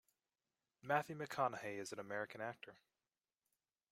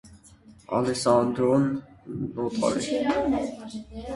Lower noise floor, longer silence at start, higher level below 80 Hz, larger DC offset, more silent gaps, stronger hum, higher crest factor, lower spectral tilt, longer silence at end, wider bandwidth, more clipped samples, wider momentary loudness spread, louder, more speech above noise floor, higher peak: first, under -90 dBFS vs -52 dBFS; first, 0.85 s vs 0.05 s; second, -88 dBFS vs -52 dBFS; neither; neither; neither; about the same, 24 dB vs 20 dB; about the same, -4.5 dB/octave vs -5.5 dB/octave; first, 1.2 s vs 0 s; first, 16 kHz vs 11.5 kHz; neither; about the same, 16 LU vs 15 LU; second, -44 LUFS vs -25 LUFS; first, over 46 dB vs 27 dB; second, -22 dBFS vs -6 dBFS